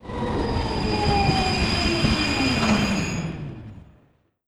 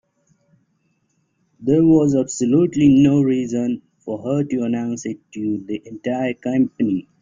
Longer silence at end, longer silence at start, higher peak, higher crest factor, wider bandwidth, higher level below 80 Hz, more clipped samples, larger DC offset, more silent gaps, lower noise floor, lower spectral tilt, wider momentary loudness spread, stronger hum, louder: first, 0.65 s vs 0.2 s; second, 0.05 s vs 1.6 s; second, -8 dBFS vs -2 dBFS; about the same, 16 dB vs 16 dB; first, 14.5 kHz vs 7.6 kHz; first, -34 dBFS vs -54 dBFS; neither; first, 0.3% vs under 0.1%; neither; second, -61 dBFS vs -67 dBFS; second, -5 dB/octave vs -7 dB/octave; about the same, 13 LU vs 14 LU; neither; second, -22 LUFS vs -19 LUFS